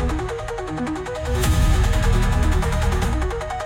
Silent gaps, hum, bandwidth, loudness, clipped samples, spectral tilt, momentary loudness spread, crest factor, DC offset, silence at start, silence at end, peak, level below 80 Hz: none; none; 16.5 kHz; -22 LUFS; under 0.1%; -5.5 dB/octave; 8 LU; 12 dB; under 0.1%; 0 s; 0 s; -6 dBFS; -22 dBFS